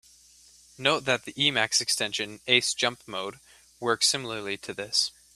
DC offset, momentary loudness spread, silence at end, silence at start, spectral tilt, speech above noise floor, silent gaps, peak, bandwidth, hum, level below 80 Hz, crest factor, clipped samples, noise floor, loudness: under 0.1%; 11 LU; 0.25 s; 0.8 s; -1.5 dB/octave; 28 dB; none; -4 dBFS; 14.5 kHz; none; -66 dBFS; 24 dB; under 0.1%; -56 dBFS; -26 LUFS